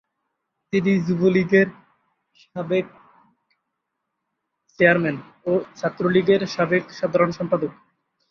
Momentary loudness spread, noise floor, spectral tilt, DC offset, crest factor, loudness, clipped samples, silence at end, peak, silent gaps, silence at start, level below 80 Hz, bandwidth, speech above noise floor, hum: 11 LU; -79 dBFS; -7 dB/octave; under 0.1%; 20 dB; -21 LUFS; under 0.1%; 0.6 s; -2 dBFS; none; 0.75 s; -62 dBFS; 6.8 kHz; 59 dB; none